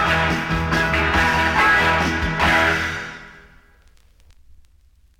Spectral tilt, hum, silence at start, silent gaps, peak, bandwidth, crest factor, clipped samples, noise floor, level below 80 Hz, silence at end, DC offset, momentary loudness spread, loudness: -4.5 dB/octave; none; 0 s; none; -6 dBFS; 16.5 kHz; 16 dB; under 0.1%; -54 dBFS; -34 dBFS; 1.85 s; under 0.1%; 10 LU; -18 LUFS